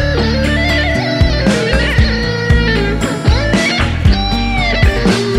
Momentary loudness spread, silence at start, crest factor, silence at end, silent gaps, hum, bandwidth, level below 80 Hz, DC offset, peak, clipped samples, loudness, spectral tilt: 2 LU; 0 s; 12 dB; 0 s; none; none; 13 kHz; -18 dBFS; under 0.1%; 0 dBFS; under 0.1%; -13 LUFS; -5.5 dB/octave